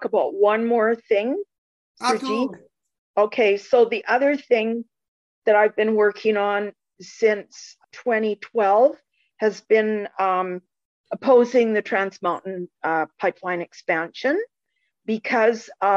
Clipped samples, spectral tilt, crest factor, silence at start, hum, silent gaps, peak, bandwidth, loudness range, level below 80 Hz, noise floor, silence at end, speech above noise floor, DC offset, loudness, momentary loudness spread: under 0.1%; -5 dB/octave; 16 dB; 0 s; none; 1.58-1.95 s, 2.98-3.14 s, 5.08-5.42 s, 10.85-11.04 s; -6 dBFS; 11 kHz; 3 LU; -76 dBFS; -75 dBFS; 0 s; 55 dB; under 0.1%; -21 LUFS; 12 LU